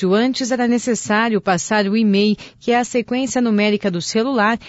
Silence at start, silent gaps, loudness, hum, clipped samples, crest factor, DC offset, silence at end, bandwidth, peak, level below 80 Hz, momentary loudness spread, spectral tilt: 0 s; none; -18 LUFS; none; under 0.1%; 12 dB; under 0.1%; 0 s; 8 kHz; -6 dBFS; -56 dBFS; 4 LU; -4.5 dB/octave